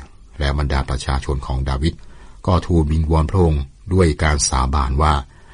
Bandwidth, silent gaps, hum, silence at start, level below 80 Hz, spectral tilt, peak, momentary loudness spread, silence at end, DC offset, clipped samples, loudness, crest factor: 10 kHz; none; none; 0 s; -22 dBFS; -5.5 dB/octave; -4 dBFS; 7 LU; 0.3 s; under 0.1%; under 0.1%; -19 LUFS; 14 dB